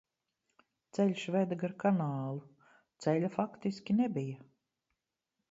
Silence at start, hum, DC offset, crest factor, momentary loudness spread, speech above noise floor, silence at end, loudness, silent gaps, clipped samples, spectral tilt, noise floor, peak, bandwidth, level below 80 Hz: 0.95 s; none; under 0.1%; 20 dB; 11 LU; 54 dB; 1.1 s; -34 LUFS; none; under 0.1%; -7.5 dB/octave; -87 dBFS; -16 dBFS; 7.8 kHz; -80 dBFS